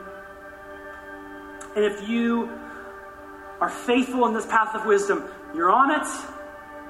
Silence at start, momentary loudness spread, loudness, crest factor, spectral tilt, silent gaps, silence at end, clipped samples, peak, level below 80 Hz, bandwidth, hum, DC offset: 0 s; 20 LU; -23 LUFS; 20 dB; -4 dB/octave; none; 0 s; under 0.1%; -6 dBFS; -58 dBFS; 15.5 kHz; none; under 0.1%